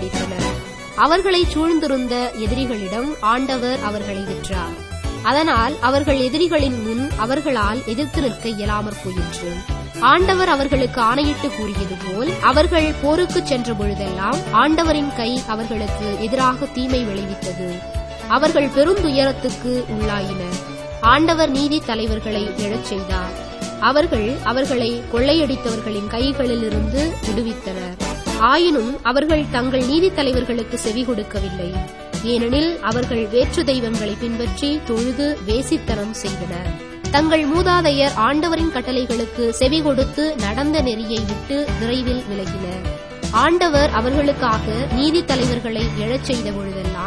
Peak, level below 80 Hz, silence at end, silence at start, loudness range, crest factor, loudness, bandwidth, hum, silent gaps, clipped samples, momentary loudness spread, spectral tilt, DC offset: 0 dBFS; -32 dBFS; 0 s; 0 s; 3 LU; 18 dB; -19 LUFS; 11 kHz; none; none; under 0.1%; 10 LU; -5 dB/octave; 0.2%